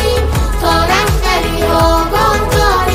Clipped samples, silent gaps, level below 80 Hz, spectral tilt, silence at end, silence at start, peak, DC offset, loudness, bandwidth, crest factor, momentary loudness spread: under 0.1%; none; -18 dBFS; -4.5 dB/octave; 0 s; 0 s; 0 dBFS; under 0.1%; -12 LUFS; 16 kHz; 10 dB; 3 LU